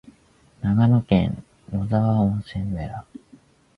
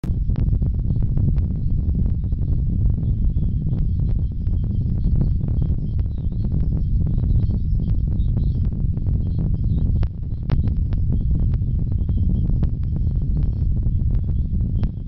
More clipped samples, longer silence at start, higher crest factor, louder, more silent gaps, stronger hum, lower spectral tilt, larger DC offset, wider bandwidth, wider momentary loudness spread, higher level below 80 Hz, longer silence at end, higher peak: neither; about the same, 0.05 s vs 0.05 s; first, 18 dB vs 12 dB; about the same, -22 LUFS vs -22 LUFS; neither; neither; second, -9.5 dB/octave vs -12 dB/octave; neither; first, 5.2 kHz vs 4 kHz; first, 14 LU vs 3 LU; second, -42 dBFS vs -22 dBFS; first, 0.75 s vs 0 s; about the same, -6 dBFS vs -8 dBFS